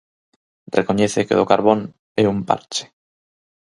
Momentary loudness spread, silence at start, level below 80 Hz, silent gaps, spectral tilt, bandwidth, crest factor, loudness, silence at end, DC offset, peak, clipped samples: 10 LU; 0.75 s; -54 dBFS; 1.99-2.15 s; -5 dB/octave; 11.5 kHz; 20 dB; -19 LUFS; 0.85 s; under 0.1%; 0 dBFS; under 0.1%